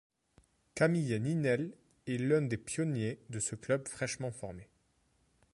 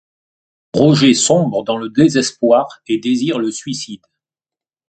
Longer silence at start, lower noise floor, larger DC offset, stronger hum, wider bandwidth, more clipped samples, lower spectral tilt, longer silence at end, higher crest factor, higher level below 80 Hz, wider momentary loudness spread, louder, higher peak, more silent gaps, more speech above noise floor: about the same, 0.75 s vs 0.75 s; second, -73 dBFS vs -90 dBFS; neither; neither; first, 11.5 kHz vs 9.2 kHz; neither; about the same, -5.5 dB/octave vs -5 dB/octave; about the same, 0.9 s vs 0.95 s; about the same, 20 dB vs 16 dB; second, -66 dBFS vs -56 dBFS; about the same, 14 LU vs 13 LU; second, -34 LUFS vs -15 LUFS; second, -16 dBFS vs 0 dBFS; neither; second, 40 dB vs 76 dB